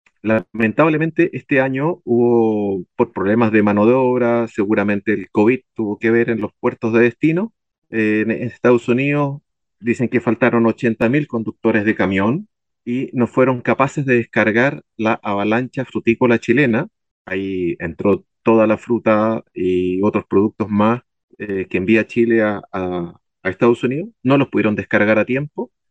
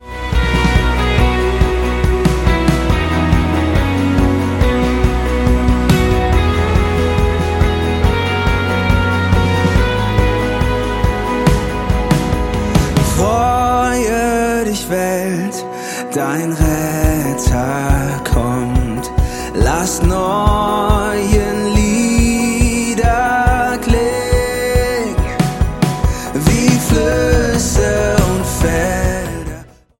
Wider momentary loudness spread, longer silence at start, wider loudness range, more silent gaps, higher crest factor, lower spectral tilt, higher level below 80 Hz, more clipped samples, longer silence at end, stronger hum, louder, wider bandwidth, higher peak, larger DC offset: first, 9 LU vs 4 LU; first, 0.25 s vs 0 s; about the same, 2 LU vs 2 LU; first, 7.78-7.82 s, 17.11-17.25 s, 21.23-21.28 s vs none; about the same, 18 dB vs 14 dB; first, -8 dB/octave vs -5.5 dB/octave; second, -60 dBFS vs -20 dBFS; neither; about the same, 0.25 s vs 0.35 s; neither; about the same, -17 LUFS vs -15 LUFS; second, 8.2 kHz vs 17 kHz; about the same, 0 dBFS vs 0 dBFS; neither